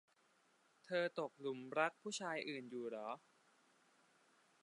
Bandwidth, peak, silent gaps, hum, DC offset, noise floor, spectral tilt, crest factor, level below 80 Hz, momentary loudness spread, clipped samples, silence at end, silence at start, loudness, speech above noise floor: 11 kHz; -22 dBFS; none; none; under 0.1%; -76 dBFS; -3.5 dB/octave; 24 dB; under -90 dBFS; 8 LU; under 0.1%; 1.45 s; 0.85 s; -44 LUFS; 32 dB